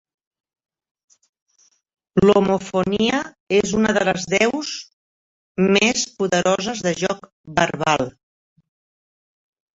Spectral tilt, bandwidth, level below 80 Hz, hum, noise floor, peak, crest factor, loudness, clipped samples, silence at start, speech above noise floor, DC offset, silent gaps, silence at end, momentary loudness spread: -4 dB/octave; 8 kHz; -52 dBFS; none; under -90 dBFS; -2 dBFS; 20 dB; -19 LUFS; under 0.1%; 2.15 s; over 71 dB; under 0.1%; 3.40-3.47 s, 4.93-5.55 s, 7.32-7.44 s; 1.65 s; 10 LU